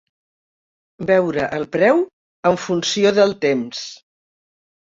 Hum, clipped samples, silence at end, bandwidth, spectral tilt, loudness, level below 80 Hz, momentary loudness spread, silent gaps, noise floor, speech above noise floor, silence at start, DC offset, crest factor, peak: none; under 0.1%; 0.9 s; 7.8 kHz; -4.5 dB/octave; -18 LUFS; -60 dBFS; 13 LU; 2.13-2.43 s; under -90 dBFS; over 72 dB; 1 s; under 0.1%; 18 dB; -2 dBFS